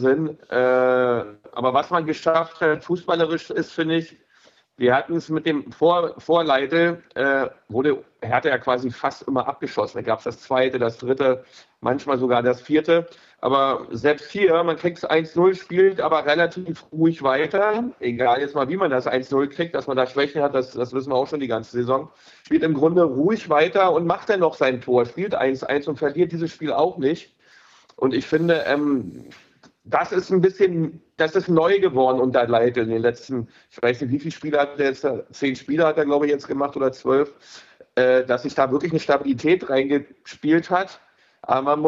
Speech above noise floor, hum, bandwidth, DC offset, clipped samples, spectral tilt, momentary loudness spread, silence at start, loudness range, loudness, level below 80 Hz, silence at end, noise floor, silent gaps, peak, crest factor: 36 dB; none; 7.6 kHz; under 0.1%; under 0.1%; -6.5 dB/octave; 8 LU; 0 s; 3 LU; -21 LUFS; -64 dBFS; 0 s; -57 dBFS; none; -4 dBFS; 16 dB